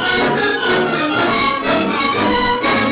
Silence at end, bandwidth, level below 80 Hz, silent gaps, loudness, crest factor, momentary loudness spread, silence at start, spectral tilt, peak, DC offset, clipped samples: 0 s; 4 kHz; -42 dBFS; none; -15 LUFS; 10 dB; 1 LU; 0 s; -8.5 dB/octave; -6 dBFS; under 0.1%; under 0.1%